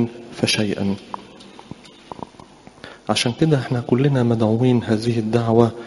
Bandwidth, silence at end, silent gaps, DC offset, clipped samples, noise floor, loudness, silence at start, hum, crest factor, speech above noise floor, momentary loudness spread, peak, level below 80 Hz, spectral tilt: 11.5 kHz; 0 s; none; under 0.1%; under 0.1%; -44 dBFS; -19 LUFS; 0 s; none; 20 dB; 26 dB; 22 LU; 0 dBFS; -54 dBFS; -6 dB/octave